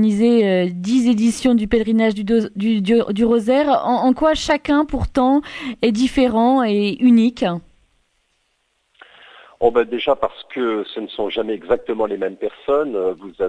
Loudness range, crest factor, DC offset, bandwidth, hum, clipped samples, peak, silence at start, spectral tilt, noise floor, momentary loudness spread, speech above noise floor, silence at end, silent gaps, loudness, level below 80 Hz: 6 LU; 16 dB; under 0.1%; 11 kHz; none; under 0.1%; -2 dBFS; 0 s; -6 dB/octave; -67 dBFS; 9 LU; 50 dB; 0 s; none; -18 LUFS; -40 dBFS